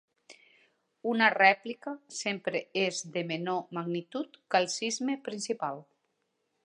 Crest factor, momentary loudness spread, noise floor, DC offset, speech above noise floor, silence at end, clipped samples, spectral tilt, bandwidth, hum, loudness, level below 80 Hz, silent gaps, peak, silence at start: 24 dB; 15 LU; -79 dBFS; under 0.1%; 48 dB; 0.85 s; under 0.1%; -3.5 dB/octave; 11 kHz; none; -30 LUFS; -86 dBFS; none; -8 dBFS; 0.3 s